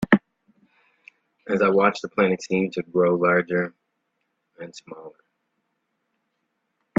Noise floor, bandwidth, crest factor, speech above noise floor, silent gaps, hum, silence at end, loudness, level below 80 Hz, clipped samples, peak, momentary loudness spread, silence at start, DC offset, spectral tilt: -76 dBFS; 7.8 kHz; 24 dB; 54 dB; none; none; 1.9 s; -22 LUFS; -64 dBFS; under 0.1%; 0 dBFS; 22 LU; 0 s; under 0.1%; -6.5 dB/octave